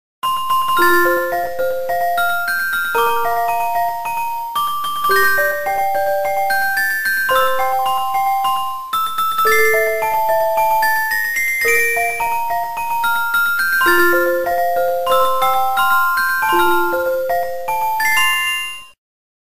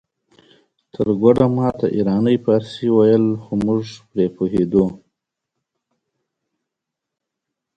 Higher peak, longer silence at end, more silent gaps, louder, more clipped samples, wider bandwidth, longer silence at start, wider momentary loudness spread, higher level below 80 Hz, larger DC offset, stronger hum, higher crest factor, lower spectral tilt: about the same, -2 dBFS vs 0 dBFS; second, 0.55 s vs 2.8 s; neither; about the same, -16 LUFS vs -18 LUFS; neither; first, 16 kHz vs 8.8 kHz; second, 0.2 s vs 1 s; about the same, 7 LU vs 8 LU; about the same, -50 dBFS vs -50 dBFS; first, 4% vs under 0.1%; neither; second, 14 dB vs 20 dB; second, -2 dB/octave vs -9 dB/octave